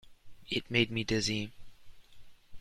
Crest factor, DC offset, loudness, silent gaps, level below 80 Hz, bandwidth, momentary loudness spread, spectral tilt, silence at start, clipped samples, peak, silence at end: 24 dB; under 0.1%; -32 LUFS; none; -54 dBFS; 14.5 kHz; 8 LU; -4 dB/octave; 0.05 s; under 0.1%; -12 dBFS; 0 s